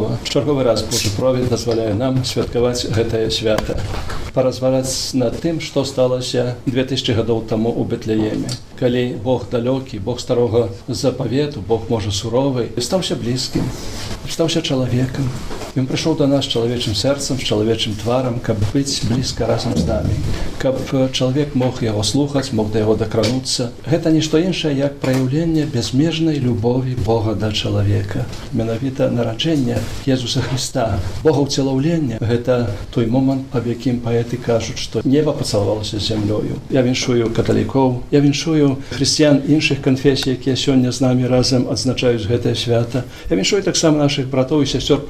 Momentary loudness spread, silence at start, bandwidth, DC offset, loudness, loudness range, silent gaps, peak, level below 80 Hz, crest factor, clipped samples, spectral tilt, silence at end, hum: 6 LU; 0 s; 15.5 kHz; under 0.1%; -18 LUFS; 4 LU; none; 0 dBFS; -36 dBFS; 16 dB; under 0.1%; -5.5 dB/octave; 0 s; none